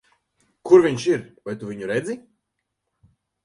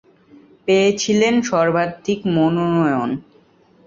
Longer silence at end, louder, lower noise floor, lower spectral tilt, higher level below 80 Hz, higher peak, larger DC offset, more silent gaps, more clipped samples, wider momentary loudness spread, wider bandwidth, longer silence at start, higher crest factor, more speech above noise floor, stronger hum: first, 1.25 s vs 0.65 s; about the same, -20 LUFS vs -18 LUFS; first, -79 dBFS vs -53 dBFS; about the same, -6 dB/octave vs -5.5 dB/octave; second, -64 dBFS vs -58 dBFS; about the same, -2 dBFS vs -4 dBFS; neither; neither; neither; first, 19 LU vs 8 LU; first, 11 kHz vs 7.8 kHz; about the same, 0.65 s vs 0.65 s; first, 22 dB vs 14 dB; first, 59 dB vs 36 dB; neither